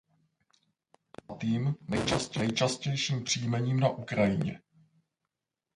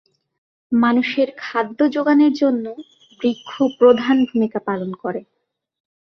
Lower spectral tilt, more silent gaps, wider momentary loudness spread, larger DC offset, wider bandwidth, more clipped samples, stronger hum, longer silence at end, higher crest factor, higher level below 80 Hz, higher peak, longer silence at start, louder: second, -5 dB/octave vs -6.5 dB/octave; neither; second, 7 LU vs 12 LU; neither; first, 11.5 kHz vs 6.4 kHz; neither; neither; first, 1.2 s vs 0.9 s; about the same, 20 dB vs 18 dB; first, -58 dBFS vs -66 dBFS; second, -12 dBFS vs -2 dBFS; first, 1.3 s vs 0.7 s; second, -30 LUFS vs -18 LUFS